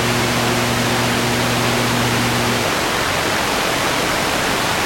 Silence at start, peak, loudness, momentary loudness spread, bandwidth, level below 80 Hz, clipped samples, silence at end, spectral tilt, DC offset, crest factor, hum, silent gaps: 0 s; -4 dBFS; -17 LUFS; 1 LU; 16.5 kHz; -40 dBFS; under 0.1%; 0 s; -3.5 dB/octave; under 0.1%; 14 dB; none; none